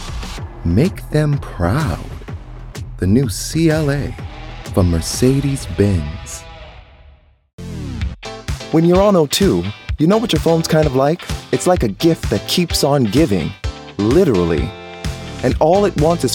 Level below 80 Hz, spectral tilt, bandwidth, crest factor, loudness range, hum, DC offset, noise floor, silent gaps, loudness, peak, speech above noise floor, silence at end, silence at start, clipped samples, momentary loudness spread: -30 dBFS; -6 dB/octave; 18 kHz; 16 dB; 5 LU; none; under 0.1%; -47 dBFS; 7.53-7.58 s; -16 LUFS; 0 dBFS; 32 dB; 0 s; 0 s; under 0.1%; 16 LU